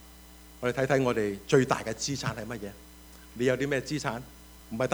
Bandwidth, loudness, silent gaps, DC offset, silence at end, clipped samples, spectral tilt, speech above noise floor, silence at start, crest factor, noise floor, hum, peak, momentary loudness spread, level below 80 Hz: over 20 kHz; -29 LUFS; none; under 0.1%; 0 s; under 0.1%; -5 dB/octave; 22 dB; 0 s; 22 dB; -51 dBFS; none; -8 dBFS; 24 LU; -54 dBFS